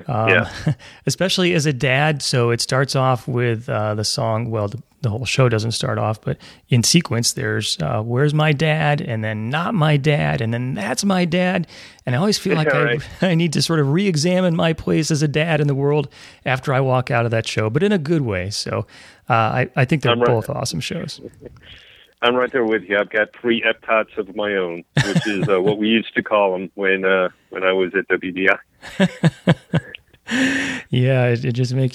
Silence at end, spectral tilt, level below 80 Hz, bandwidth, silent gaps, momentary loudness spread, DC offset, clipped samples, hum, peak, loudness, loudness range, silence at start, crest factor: 0 s; -5 dB/octave; -52 dBFS; 14.5 kHz; none; 8 LU; under 0.1%; under 0.1%; none; -2 dBFS; -19 LUFS; 2 LU; 0 s; 18 dB